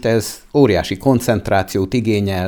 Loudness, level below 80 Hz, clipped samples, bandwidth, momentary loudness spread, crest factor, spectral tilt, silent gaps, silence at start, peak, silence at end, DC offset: -17 LUFS; -40 dBFS; under 0.1%; over 20 kHz; 5 LU; 16 dB; -6 dB/octave; none; 0 s; 0 dBFS; 0 s; under 0.1%